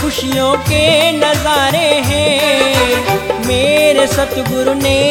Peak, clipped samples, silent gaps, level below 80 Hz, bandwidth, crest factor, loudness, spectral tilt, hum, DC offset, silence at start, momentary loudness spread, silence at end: 0 dBFS; under 0.1%; none; -34 dBFS; 17.5 kHz; 12 dB; -12 LUFS; -4 dB/octave; none; under 0.1%; 0 s; 5 LU; 0 s